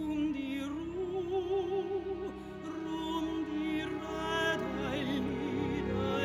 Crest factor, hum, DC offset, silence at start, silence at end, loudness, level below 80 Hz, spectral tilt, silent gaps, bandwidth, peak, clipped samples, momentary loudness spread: 16 dB; none; under 0.1%; 0 s; 0 s; -35 LUFS; -54 dBFS; -6 dB/octave; none; 15 kHz; -18 dBFS; under 0.1%; 6 LU